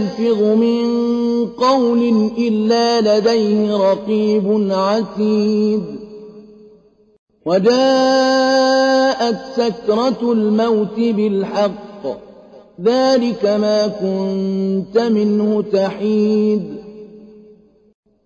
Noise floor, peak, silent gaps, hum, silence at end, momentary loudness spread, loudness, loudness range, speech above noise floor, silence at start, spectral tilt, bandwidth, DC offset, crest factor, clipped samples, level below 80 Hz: -49 dBFS; -4 dBFS; 7.19-7.27 s; none; 1 s; 7 LU; -16 LUFS; 3 LU; 34 dB; 0 s; -6 dB/octave; 7.6 kHz; under 0.1%; 12 dB; under 0.1%; -58 dBFS